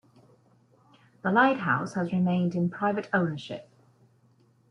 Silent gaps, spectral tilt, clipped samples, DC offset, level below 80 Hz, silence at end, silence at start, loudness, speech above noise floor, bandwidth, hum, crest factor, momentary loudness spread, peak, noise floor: none; -7.5 dB/octave; under 0.1%; under 0.1%; -70 dBFS; 1.1 s; 1.25 s; -27 LUFS; 37 dB; 7.4 kHz; none; 20 dB; 13 LU; -8 dBFS; -63 dBFS